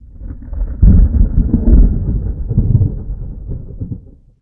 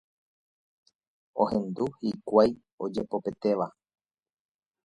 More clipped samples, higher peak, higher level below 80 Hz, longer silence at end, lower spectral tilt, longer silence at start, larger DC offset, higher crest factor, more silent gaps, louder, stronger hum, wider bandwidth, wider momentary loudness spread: neither; first, 0 dBFS vs -6 dBFS; first, -14 dBFS vs -64 dBFS; second, 0.4 s vs 1.15 s; first, -16 dB/octave vs -8 dB/octave; second, 0.2 s vs 1.35 s; neither; second, 12 dB vs 24 dB; second, none vs 2.72-2.78 s; first, -14 LUFS vs -29 LUFS; neither; second, 1.7 kHz vs 10.5 kHz; first, 17 LU vs 12 LU